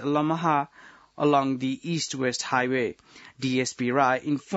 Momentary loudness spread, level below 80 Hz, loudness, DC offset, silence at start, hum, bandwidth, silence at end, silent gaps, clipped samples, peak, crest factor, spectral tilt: 6 LU; -70 dBFS; -26 LUFS; under 0.1%; 0 s; none; 8.2 kHz; 0 s; none; under 0.1%; -8 dBFS; 18 dB; -5 dB/octave